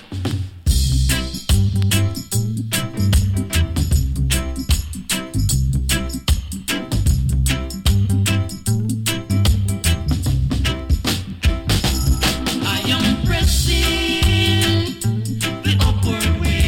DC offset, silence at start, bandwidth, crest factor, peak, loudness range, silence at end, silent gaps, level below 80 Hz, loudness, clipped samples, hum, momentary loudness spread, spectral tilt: under 0.1%; 0 s; 17 kHz; 14 dB; -4 dBFS; 3 LU; 0 s; none; -22 dBFS; -19 LUFS; under 0.1%; none; 5 LU; -4.5 dB/octave